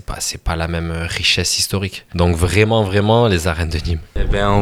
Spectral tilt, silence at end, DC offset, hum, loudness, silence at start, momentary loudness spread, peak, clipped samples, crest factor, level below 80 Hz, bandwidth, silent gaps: -4.5 dB/octave; 0 s; under 0.1%; none; -17 LUFS; 0.1 s; 9 LU; 0 dBFS; under 0.1%; 16 dB; -26 dBFS; 16 kHz; none